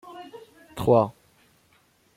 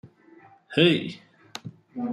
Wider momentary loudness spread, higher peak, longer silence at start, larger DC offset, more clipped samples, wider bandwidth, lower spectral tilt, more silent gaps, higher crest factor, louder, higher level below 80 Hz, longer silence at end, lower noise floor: about the same, 22 LU vs 21 LU; about the same, -6 dBFS vs -6 dBFS; about the same, 0.05 s vs 0.05 s; neither; neither; first, 16.5 kHz vs 12.5 kHz; first, -8 dB/octave vs -6 dB/octave; neither; about the same, 22 dB vs 22 dB; about the same, -23 LUFS vs -23 LUFS; first, -56 dBFS vs -68 dBFS; first, 1.05 s vs 0 s; first, -63 dBFS vs -54 dBFS